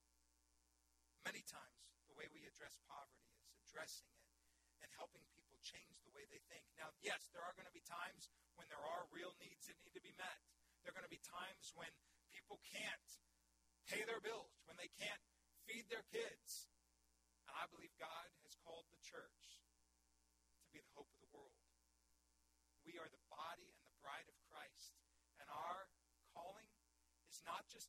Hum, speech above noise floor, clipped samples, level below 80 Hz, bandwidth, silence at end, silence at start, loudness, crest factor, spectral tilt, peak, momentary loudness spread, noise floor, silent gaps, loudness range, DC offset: none; 26 dB; under 0.1%; -86 dBFS; 16 kHz; 0 s; 1.2 s; -55 LUFS; 26 dB; -1.5 dB/octave; -32 dBFS; 15 LU; -82 dBFS; none; 10 LU; under 0.1%